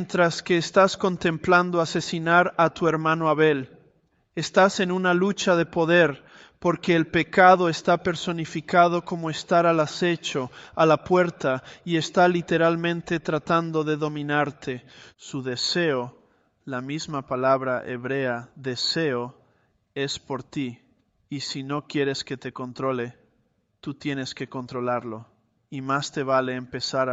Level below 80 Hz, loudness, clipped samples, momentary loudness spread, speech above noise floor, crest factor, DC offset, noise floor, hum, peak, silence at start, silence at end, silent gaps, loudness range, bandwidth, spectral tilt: -62 dBFS; -23 LUFS; under 0.1%; 14 LU; 45 dB; 22 dB; under 0.1%; -69 dBFS; none; -2 dBFS; 0 s; 0 s; none; 10 LU; 8.2 kHz; -5 dB/octave